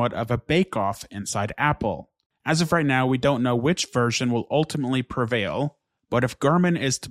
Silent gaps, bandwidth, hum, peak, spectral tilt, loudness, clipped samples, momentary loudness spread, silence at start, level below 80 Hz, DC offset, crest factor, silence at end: 2.26-2.30 s; 15 kHz; none; -6 dBFS; -5 dB/octave; -23 LUFS; under 0.1%; 8 LU; 0 s; -52 dBFS; under 0.1%; 16 dB; 0 s